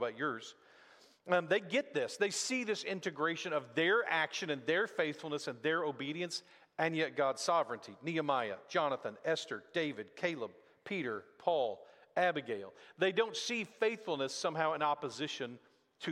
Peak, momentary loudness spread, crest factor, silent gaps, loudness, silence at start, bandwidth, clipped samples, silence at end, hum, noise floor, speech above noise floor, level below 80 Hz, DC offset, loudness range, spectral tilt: -16 dBFS; 10 LU; 20 dB; none; -36 LUFS; 0 s; 13.5 kHz; under 0.1%; 0 s; none; -63 dBFS; 27 dB; -86 dBFS; under 0.1%; 3 LU; -3.5 dB/octave